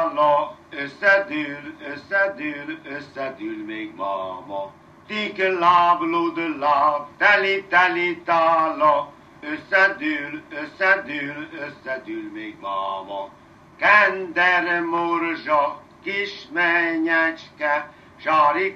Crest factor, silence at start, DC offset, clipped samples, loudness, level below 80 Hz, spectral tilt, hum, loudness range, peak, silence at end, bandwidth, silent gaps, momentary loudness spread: 20 dB; 0 s; under 0.1%; under 0.1%; -20 LUFS; -66 dBFS; -5 dB/octave; none; 7 LU; -2 dBFS; 0 s; 8 kHz; none; 16 LU